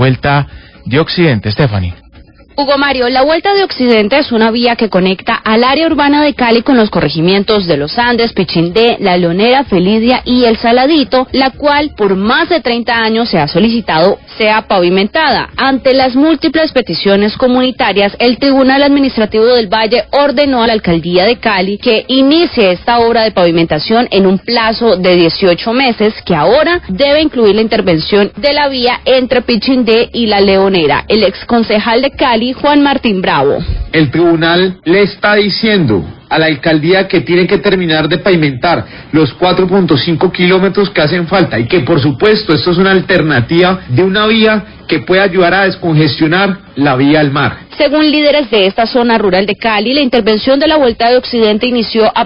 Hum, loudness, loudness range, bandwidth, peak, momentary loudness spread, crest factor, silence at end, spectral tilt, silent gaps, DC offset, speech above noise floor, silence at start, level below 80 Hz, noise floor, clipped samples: none; -9 LUFS; 1 LU; 5.4 kHz; 0 dBFS; 4 LU; 10 dB; 0 s; -9 dB/octave; none; under 0.1%; 29 dB; 0 s; -34 dBFS; -38 dBFS; under 0.1%